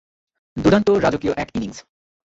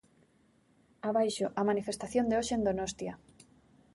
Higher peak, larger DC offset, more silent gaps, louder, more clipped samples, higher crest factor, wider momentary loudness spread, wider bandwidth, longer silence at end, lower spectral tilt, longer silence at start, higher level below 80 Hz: first, -2 dBFS vs -16 dBFS; neither; neither; first, -19 LUFS vs -32 LUFS; neither; about the same, 18 dB vs 18 dB; first, 15 LU vs 11 LU; second, 8 kHz vs 11.5 kHz; second, 0.45 s vs 0.8 s; first, -6.5 dB/octave vs -4.5 dB/octave; second, 0.55 s vs 1.05 s; first, -44 dBFS vs -60 dBFS